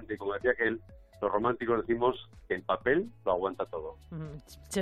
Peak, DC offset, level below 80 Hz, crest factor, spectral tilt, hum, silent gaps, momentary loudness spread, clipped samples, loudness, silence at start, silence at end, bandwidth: -14 dBFS; under 0.1%; -56 dBFS; 18 dB; -5.5 dB/octave; none; none; 14 LU; under 0.1%; -31 LUFS; 0 s; 0 s; 14 kHz